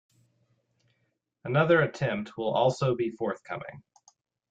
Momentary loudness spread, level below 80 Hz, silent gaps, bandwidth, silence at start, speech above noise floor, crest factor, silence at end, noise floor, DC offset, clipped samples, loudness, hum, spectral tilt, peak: 16 LU; -68 dBFS; none; 9 kHz; 1.45 s; 50 dB; 18 dB; 0.7 s; -77 dBFS; under 0.1%; under 0.1%; -27 LUFS; none; -6.5 dB/octave; -12 dBFS